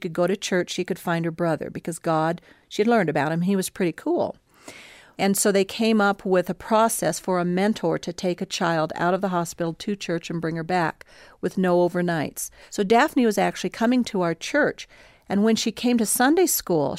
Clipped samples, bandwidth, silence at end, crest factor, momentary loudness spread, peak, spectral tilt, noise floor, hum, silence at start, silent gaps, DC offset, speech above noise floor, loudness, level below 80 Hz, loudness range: under 0.1%; 16 kHz; 0 s; 16 dB; 9 LU; -6 dBFS; -4.5 dB/octave; -45 dBFS; none; 0 s; none; under 0.1%; 23 dB; -23 LUFS; -60 dBFS; 3 LU